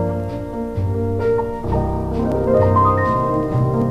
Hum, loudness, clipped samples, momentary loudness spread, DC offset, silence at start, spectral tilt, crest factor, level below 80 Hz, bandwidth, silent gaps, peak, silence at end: none; -19 LUFS; under 0.1%; 9 LU; under 0.1%; 0 s; -9.5 dB/octave; 14 dB; -32 dBFS; 7.4 kHz; none; -4 dBFS; 0 s